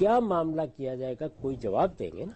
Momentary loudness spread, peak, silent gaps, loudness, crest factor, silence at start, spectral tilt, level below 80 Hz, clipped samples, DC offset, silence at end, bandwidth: 9 LU; -14 dBFS; none; -30 LUFS; 16 dB; 0 s; -8.5 dB/octave; -56 dBFS; under 0.1%; under 0.1%; 0 s; 8.4 kHz